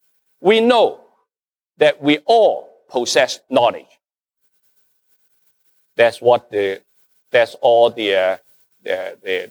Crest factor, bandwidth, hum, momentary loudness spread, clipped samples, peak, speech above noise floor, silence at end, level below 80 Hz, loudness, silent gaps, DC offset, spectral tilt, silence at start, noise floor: 16 dB; over 20 kHz; none; 12 LU; under 0.1%; -2 dBFS; over 74 dB; 0.05 s; -74 dBFS; -16 LUFS; none; under 0.1%; -3.5 dB/octave; 0.4 s; under -90 dBFS